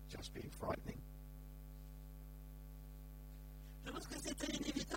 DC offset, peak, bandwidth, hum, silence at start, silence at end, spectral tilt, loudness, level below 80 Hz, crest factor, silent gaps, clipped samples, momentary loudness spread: under 0.1%; -28 dBFS; 17 kHz; none; 0 s; 0 s; -4 dB/octave; -49 LUFS; -54 dBFS; 20 dB; none; under 0.1%; 13 LU